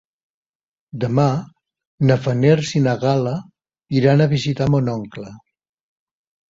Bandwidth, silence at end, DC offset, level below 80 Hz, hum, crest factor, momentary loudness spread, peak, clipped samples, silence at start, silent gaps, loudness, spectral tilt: 7.6 kHz; 1.1 s; under 0.1%; -52 dBFS; none; 18 dB; 14 LU; -2 dBFS; under 0.1%; 0.95 s; 1.87-1.98 s; -18 LUFS; -7.5 dB/octave